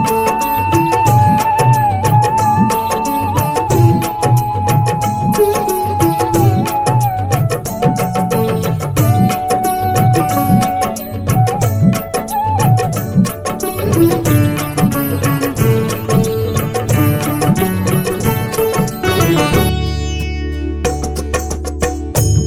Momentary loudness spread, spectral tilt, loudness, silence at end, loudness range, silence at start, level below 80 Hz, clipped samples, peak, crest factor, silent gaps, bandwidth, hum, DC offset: 7 LU; -6 dB/octave; -14 LUFS; 0 s; 3 LU; 0 s; -30 dBFS; under 0.1%; 0 dBFS; 14 dB; none; 17.5 kHz; none; under 0.1%